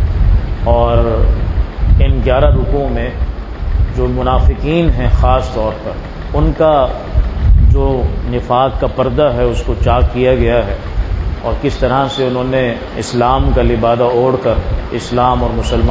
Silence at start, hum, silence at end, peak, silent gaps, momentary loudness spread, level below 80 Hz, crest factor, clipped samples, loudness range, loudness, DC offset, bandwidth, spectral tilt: 0 s; none; 0 s; 0 dBFS; none; 8 LU; -16 dBFS; 12 dB; under 0.1%; 2 LU; -14 LUFS; under 0.1%; 8 kHz; -7.5 dB/octave